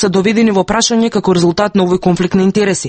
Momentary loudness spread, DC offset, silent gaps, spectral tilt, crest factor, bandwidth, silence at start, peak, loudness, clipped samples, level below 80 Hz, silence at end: 2 LU; under 0.1%; none; -5 dB/octave; 12 dB; 8.8 kHz; 0 s; 0 dBFS; -12 LUFS; under 0.1%; -40 dBFS; 0 s